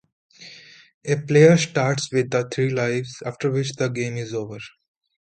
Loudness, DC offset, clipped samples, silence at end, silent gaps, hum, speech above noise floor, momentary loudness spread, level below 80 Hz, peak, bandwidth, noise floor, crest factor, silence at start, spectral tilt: -21 LUFS; under 0.1%; under 0.1%; 0.65 s; 0.94-1.01 s; none; 25 dB; 22 LU; -62 dBFS; -2 dBFS; 9.2 kHz; -46 dBFS; 20 dB; 0.4 s; -5.5 dB/octave